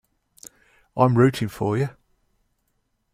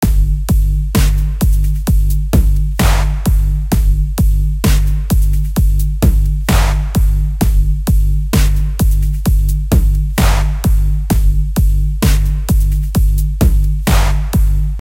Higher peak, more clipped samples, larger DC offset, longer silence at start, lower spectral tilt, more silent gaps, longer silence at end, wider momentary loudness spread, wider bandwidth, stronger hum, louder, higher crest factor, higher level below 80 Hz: second, -4 dBFS vs 0 dBFS; neither; neither; first, 0.95 s vs 0 s; first, -7.5 dB/octave vs -6 dB/octave; neither; first, 1.25 s vs 0.1 s; first, 12 LU vs 2 LU; about the same, 15.5 kHz vs 16.5 kHz; neither; second, -21 LUFS vs -15 LUFS; first, 22 dB vs 12 dB; second, -58 dBFS vs -12 dBFS